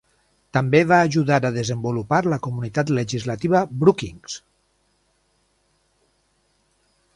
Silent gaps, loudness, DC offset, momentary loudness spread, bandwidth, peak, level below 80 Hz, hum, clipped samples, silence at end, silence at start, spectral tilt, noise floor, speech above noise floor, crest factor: none; -20 LUFS; under 0.1%; 11 LU; 11.5 kHz; -2 dBFS; -54 dBFS; 50 Hz at -45 dBFS; under 0.1%; 2.75 s; 0.55 s; -6.5 dB/octave; -66 dBFS; 46 dB; 20 dB